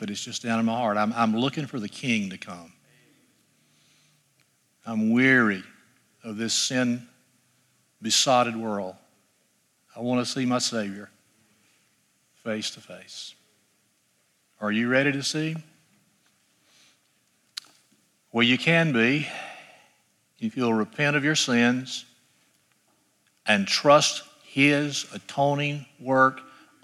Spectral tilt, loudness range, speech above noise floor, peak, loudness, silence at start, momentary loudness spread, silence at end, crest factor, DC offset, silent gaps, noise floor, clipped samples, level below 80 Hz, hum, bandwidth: -4 dB/octave; 10 LU; 44 dB; -4 dBFS; -24 LUFS; 0 s; 20 LU; 0.4 s; 22 dB; under 0.1%; none; -68 dBFS; under 0.1%; -78 dBFS; none; 13.5 kHz